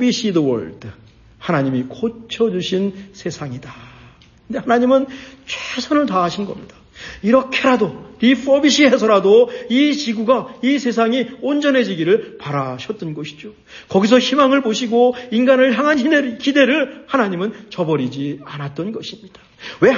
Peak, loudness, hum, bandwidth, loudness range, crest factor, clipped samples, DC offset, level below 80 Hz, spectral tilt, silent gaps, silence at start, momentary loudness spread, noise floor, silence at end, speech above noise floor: -2 dBFS; -17 LUFS; none; 7.4 kHz; 7 LU; 16 dB; under 0.1%; under 0.1%; -54 dBFS; -5 dB/octave; none; 0 s; 16 LU; -46 dBFS; 0 s; 29 dB